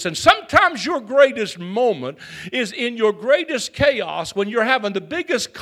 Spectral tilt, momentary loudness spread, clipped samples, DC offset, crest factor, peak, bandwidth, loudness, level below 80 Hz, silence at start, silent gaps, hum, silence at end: -3.5 dB/octave; 10 LU; under 0.1%; under 0.1%; 20 dB; 0 dBFS; 14.5 kHz; -19 LUFS; -52 dBFS; 0 s; none; none; 0 s